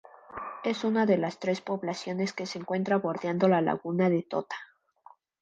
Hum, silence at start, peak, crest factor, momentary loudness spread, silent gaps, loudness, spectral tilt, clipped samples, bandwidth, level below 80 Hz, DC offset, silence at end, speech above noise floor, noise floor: none; 0.3 s; -10 dBFS; 20 dB; 13 LU; none; -29 LUFS; -6.5 dB/octave; under 0.1%; 8 kHz; -74 dBFS; under 0.1%; 0.75 s; 30 dB; -58 dBFS